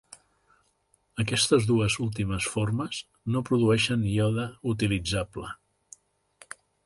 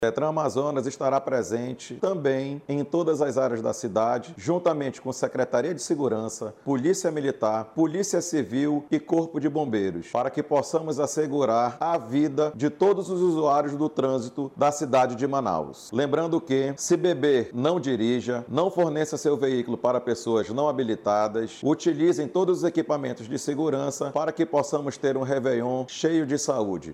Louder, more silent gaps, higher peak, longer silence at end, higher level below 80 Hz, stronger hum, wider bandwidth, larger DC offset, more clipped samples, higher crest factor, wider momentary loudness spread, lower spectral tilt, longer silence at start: about the same, -26 LUFS vs -25 LUFS; neither; about the same, -10 dBFS vs -8 dBFS; first, 1.3 s vs 0 s; first, -50 dBFS vs -68 dBFS; first, 50 Hz at -50 dBFS vs none; second, 11.5 kHz vs 13.5 kHz; neither; neither; about the same, 18 dB vs 16 dB; first, 18 LU vs 5 LU; about the same, -5 dB/octave vs -5.5 dB/octave; first, 1.15 s vs 0 s